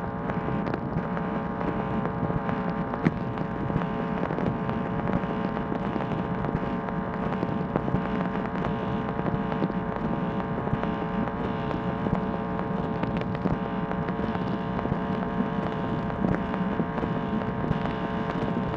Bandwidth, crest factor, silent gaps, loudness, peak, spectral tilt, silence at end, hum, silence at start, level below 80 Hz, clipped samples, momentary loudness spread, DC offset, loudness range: 6.6 kHz; 22 dB; none; -29 LUFS; -6 dBFS; -9 dB/octave; 0 s; none; 0 s; -44 dBFS; under 0.1%; 2 LU; under 0.1%; 1 LU